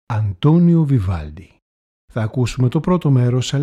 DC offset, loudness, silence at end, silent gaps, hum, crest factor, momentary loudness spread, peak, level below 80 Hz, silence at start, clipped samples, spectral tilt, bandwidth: under 0.1%; -17 LUFS; 0 s; 1.62-2.08 s; none; 14 dB; 12 LU; -2 dBFS; -40 dBFS; 0.1 s; under 0.1%; -7.5 dB/octave; 9.8 kHz